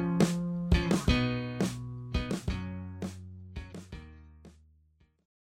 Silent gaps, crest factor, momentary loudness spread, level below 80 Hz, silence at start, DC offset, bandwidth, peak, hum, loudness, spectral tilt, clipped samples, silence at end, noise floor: none; 22 dB; 18 LU; -40 dBFS; 0 s; under 0.1%; 15.5 kHz; -10 dBFS; none; -32 LUFS; -6 dB/octave; under 0.1%; 0.95 s; -67 dBFS